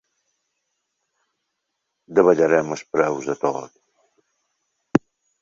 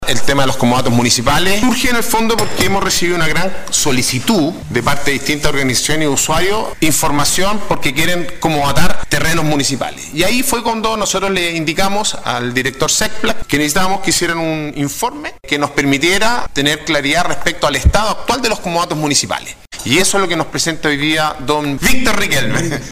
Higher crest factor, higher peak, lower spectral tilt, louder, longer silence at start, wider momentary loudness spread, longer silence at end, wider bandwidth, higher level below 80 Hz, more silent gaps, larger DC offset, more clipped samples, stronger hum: first, 22 dB vs 14 dB; about the same, -2 dBFS vs 0 dBFS; first, -6.5 dB/octave vs -3 dB/octave; second, -20 LUFS vs -14 LUFS; first, 2.1 s vs 0 s; first, 9 LU vs 5 LU; first, 0.45 s vs 0 s; second, 7.8 kHz vs 16 kHz; second, -62 dBFS vs -30 dBFS; neither; second, under 0.1% vs 8%; neither; neither